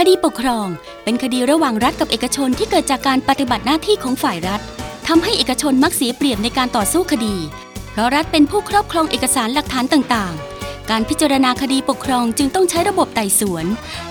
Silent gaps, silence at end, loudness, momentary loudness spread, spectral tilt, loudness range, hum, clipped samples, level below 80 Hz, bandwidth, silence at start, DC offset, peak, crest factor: none; 0 s; -17 LUFS; 9 LU; -3.5 dB/octave; 1 LU; none; under 0.1%; -40 dBFS; over 20 kHz; 0 s; under 0.1%; 0 dBFS; 16 dB